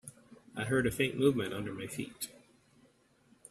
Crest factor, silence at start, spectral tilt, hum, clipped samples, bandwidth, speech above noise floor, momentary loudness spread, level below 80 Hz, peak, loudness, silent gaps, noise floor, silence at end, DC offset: 22 dB; 0.05 s; -5 dB/octave; none; under 0.1%; 15 kHz; 34 dB; 14 LU; -62 dBFS; -14 dBFS; -34 LUFS; none; -67 dBFS; 1.15 s; under 0.1%